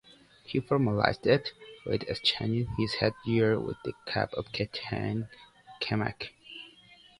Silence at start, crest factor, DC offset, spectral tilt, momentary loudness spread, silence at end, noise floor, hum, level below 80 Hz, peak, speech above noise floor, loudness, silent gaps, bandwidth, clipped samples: 0.5 s; 24 dB; under 0.1%; -6.5 dB/octave; 15 LU; 0.25 s; -57 dBFS; none; -56 dBFS; -6 dBFS; 27 dB; -30 LUFS; none; 11.5 kHz; under 0.1%